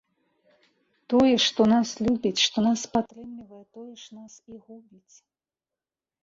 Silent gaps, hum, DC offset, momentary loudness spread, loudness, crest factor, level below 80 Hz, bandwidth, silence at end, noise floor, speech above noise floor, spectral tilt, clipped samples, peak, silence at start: none; none; under 0.1%; 24 LU; -23 LUFS; 18 dB; -60 dBFS; 7.8 kHz; 1.45 s; under -90 dBFS; over 65 dB; -4 dB/octave; under 0.1%; -8 dBFS; 1.1 s